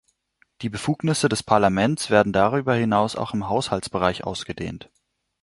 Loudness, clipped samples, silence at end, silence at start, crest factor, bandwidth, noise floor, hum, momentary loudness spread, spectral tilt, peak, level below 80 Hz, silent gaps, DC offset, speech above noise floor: -22 LUFS; under 0.1%; 0.65 s; 0.6 s; 20 dB; 11.5 kHz; -65 dBFS; none; 12 LU; -5 dB/octave; -2 dBFS; -50 dBFS; none; under 0.1%; 43 dB